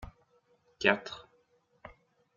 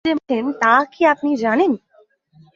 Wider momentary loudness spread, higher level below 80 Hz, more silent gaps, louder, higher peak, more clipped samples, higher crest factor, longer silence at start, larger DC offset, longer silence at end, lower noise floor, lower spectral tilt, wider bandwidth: first, 26 LU vs 6 LU; about the same, -62 dBFS vs -62 dBFS; neither; second, -30 LUFS vs -17 LUFS; second, -8 dBFS vs -2 dBFS; neither; first, 30 dB vs 18 dB; about the same, 0 s vs 0.05 s; neither; second, 0.5 s vs 0.8 s; first, -70 dBFS vs -55 dBFS; about the same, -4 dB/octave vs -5 dB/octave; about the same, 7.6 kHz vs 7.4 kHz